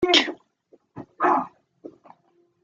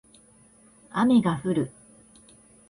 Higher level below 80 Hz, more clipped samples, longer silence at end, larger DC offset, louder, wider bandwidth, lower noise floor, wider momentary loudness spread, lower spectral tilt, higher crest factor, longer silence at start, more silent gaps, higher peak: about the same, -64 dBFS vs -62 dBFS; neither; second, 0.75 s vs 1 s; neither; about the same, -22 LUFS vs -24 LUFS; second, 7.8 kHz vs 10.5 kHz; first, -64 dBFS vs -56 dBFS; first, 27 LU vs 13 LU; second, -2.5 dB/octave vs -7 dB/octave; first, 24 dB vs 18 dB; second, 0 s vs 0.95 s; neither; first, -2 dBFS vs -10 dBFS